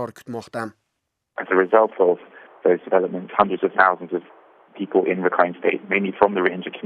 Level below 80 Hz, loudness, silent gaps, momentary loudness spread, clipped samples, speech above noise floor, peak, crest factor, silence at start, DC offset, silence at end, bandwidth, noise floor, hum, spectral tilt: -64 dBFS; -20 LUFS; none; 14 LU; under 0.1%; 57 dB; -2 dBFS; 20 dB; 0 s; under 0.1%; 0.05 s; 10.5 kHz; -77 dBFS; none; -7 dB/octave